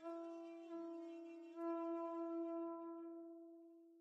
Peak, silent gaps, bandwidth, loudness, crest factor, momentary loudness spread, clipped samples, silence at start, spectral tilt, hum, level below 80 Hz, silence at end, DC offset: -34 dBFS; none; 6.4 kHz; -49 LUFS; 14 dB; 13 LU; under 0.1%; 0 s; -5.5 dB/octave; none; under -90 dBFS; 0 s; under 0.1%